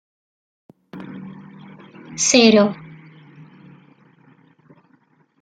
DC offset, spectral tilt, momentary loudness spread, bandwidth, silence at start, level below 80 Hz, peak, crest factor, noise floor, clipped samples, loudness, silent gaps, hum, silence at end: under 0.1%; -3 dB/octave; 29 LU; 10 kHz; 0.95 s; -66 dBFS; -2 dBFS; 22 dB; -59 dBFS; under 0.1%; -14 LUFS; none; none; 2.7 s